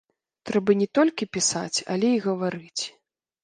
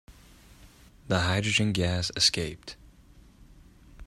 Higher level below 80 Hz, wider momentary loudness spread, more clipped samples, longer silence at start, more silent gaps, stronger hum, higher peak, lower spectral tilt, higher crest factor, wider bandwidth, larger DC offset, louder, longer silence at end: second, -68 dBFS vs -52 dBFS; second, 10 LU vs 15 LU; neither; first, 0.45 s vs 0.1 s; neither; neither; about the same, -8 dBFS vs -8 dBFS; about the same, -4 dB/octave vs -3.5 dB/octave; about the same, 18 dB vs 22 dB; second, 10 kHz vs 15 kHz; neither; about the same, -24 LUFS vs -26 LUFS; first, 0.55 s vs 0 s